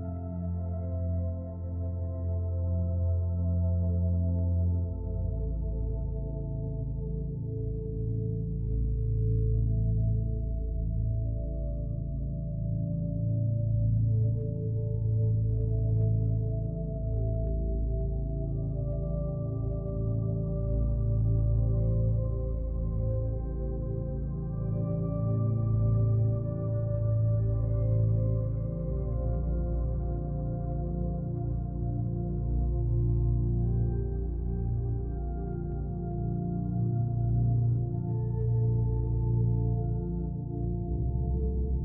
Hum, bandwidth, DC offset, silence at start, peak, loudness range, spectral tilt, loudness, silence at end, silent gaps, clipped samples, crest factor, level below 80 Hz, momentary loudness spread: none; 1.5 kHz; under 0.1%; 0 s; -16 dBFS; 4 LU; -14.5 dB/octave; -31 LUFS; 0 s; none; under 0.1%; 12 dB; -34 dBFS; 7 LU